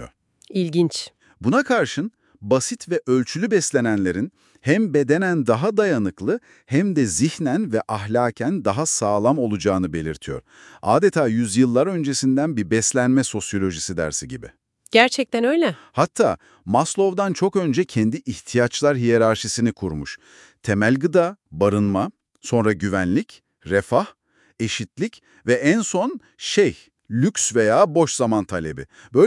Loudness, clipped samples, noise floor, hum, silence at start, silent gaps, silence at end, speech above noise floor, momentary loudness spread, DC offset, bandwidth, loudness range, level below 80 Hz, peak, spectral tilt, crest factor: -20 LUFS; under 0.1%; -45 dBFS; none; 0 s; none; 0 s; 25 dB; 11 LU; under 0.1%; 12 kHz; 3 LU; -56 dBFS; 0 dBFS; -5 dB/octave; 20 dB